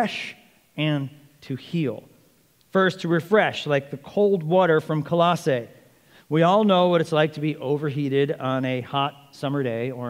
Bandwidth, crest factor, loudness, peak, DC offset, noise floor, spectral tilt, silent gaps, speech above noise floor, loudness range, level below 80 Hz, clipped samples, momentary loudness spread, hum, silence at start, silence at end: 16 kHz; 18 dB; -23 LUFS; -6 dBFS; under 0.1%; -60 dBFS; -7 dB/octave; none; 38 dB; 4 LU; -70 dBFS; under 0.1%; 11 LU; none; 0 s; 0 s